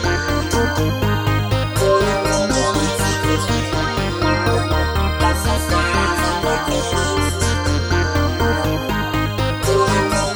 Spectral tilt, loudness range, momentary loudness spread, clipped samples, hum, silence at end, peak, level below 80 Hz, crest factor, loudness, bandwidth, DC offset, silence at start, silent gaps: -4.5 dB/octave; 1 LU; 3 LU; under 0.1%; none; 0 s; -2 dBFS; -28 dBFS; 14 dB; -18 LUFS; over 20 kHz; under 0.1%; 0 s; none